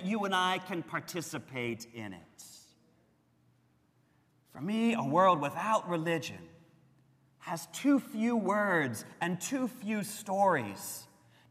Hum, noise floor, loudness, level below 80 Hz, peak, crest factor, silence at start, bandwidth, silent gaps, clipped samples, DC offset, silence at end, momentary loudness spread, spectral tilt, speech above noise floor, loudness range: none; -70 dBFS; -32 LUFS; -80 dBFS; -14 dBFS; 20 dB; 0 s; 15.5 kHz; none; under 0.1%; under 0.1%; 0.45 s; 16 LU; -4.5 dB/octave; 38 dB; 11 LU